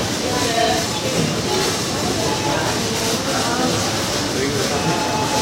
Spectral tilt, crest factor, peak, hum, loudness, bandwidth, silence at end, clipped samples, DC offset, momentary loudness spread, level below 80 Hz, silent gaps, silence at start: -3.5 dB/octave; 14 dB; -6 dBFS; none; -19 LUFS; 16 kHz; 0 s; under 0.1%; under 0.1%; 2 LU; -42 dBFS; none; 0 s